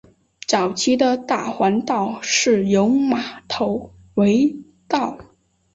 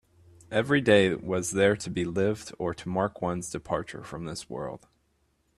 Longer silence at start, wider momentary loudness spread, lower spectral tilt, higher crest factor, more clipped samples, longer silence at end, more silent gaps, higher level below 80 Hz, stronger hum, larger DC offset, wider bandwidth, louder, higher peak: about the same, 0.5 s vs 0.5 s; second, 10 LU vs 15 LU; about the same, -4 dB/octave vs -5 dB/octave; about the same, 16 dB vs 20 dB; neither; second, 0.55 s vs 0.8 s; neither; about the same, -56 dBFS vs -58 dBFS; neither; neither; second, 8 kHz vs 13 kHz; first, -19 LUFS vs -28 LUFS; first, -4 dBFS vs -8 dBFS